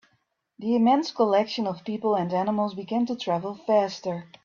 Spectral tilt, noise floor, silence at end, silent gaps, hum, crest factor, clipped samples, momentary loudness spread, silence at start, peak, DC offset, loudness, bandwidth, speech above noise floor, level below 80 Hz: -6.5 dB/octave; -72 dBFS; 0.2 s; none; none; 16 dB; under 0.1%; 8 LU; 0.6 s; -8 dBFS; under 0.1%; -25 LUFS; 7.2 kHz; 47 dB; -70 dBFS